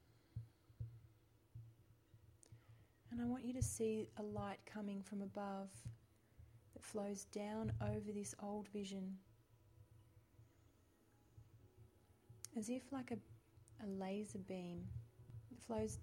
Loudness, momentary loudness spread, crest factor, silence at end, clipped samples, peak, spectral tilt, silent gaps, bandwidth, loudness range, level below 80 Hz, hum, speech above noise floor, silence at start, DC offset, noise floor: -48 LUFS; 24 LU; 24 dB; 0 s; under 0.1%; -26 dBFS; -6 dB/octave; none; 16.5 kHz; 9 LU; -66 dBFS; none; 27 dB; 0.1 s; under 0.1%; -74 dBFS